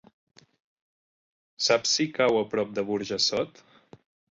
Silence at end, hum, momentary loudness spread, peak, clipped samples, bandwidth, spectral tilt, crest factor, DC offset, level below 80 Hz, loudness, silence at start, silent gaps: 0.85 s; none; 7 LU; -8 dBFS; under 0.1%; 8 kHz; -2.5 dB/octave; 22 dB; under 0.1%; -68 dBFS; -25 LUFS; 1.6 s; none